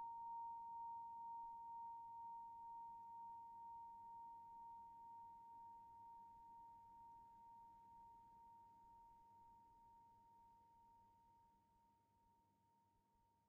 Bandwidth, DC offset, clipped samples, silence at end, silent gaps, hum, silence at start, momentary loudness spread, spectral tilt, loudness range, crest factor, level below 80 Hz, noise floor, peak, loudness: 3 kHz; under 0.1%; under 0.1%; 0 s; none; none; 0 s; 14 LU; -3 dB/octave; 12 LU; 12 dB; -86 dBFS; -81 dBFS; -48 dBFS; -58 LUFS